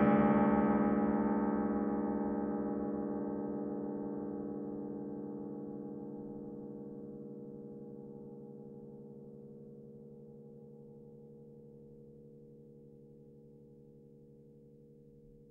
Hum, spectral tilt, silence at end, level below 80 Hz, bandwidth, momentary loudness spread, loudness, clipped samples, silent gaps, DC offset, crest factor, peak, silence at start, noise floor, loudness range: none; -9 dB/octave; 0 s; -64 dBFS; 3.4 kHz; 26 LU; -36 LUFS; under 0.1%; none; under 0.1%; 20 dB; -18 dBFS; 0 s; -59 dBFS; 22 LU